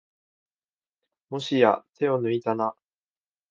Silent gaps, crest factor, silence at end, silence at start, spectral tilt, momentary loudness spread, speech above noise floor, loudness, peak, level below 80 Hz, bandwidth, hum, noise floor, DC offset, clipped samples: none; 24 dB; 0.8 s; 1.3 s; -6.5 dB/octave; 11 LU; over 66 dB; -25 LUFS; -4 dBFS; -74 dBFS; 7.6 kHz; none; under -90 dBFS; under 0.1%; under 0.1%